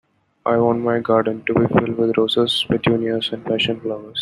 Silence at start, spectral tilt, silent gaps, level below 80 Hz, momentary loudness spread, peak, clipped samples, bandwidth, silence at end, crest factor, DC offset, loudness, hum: 0.45 s; -6.5 dB/octave; none; -54 dBFS; 5 LU; -2 dBFS; under 0.1%; 12 kHz; 0 s; 16 dB; under 0.1%; -19 LUFS; none